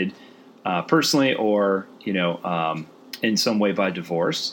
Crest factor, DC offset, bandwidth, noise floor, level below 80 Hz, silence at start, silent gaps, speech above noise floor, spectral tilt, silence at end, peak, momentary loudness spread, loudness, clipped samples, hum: 20 dB; under 0.1%; 17 kHz; -48 dBFS; -74 dBFS; 0 s; none; 26 dB; -4.5 dB/octave; 0 s; -4 dBFS; 8 LU; -22 LUFS; under 0.1%; none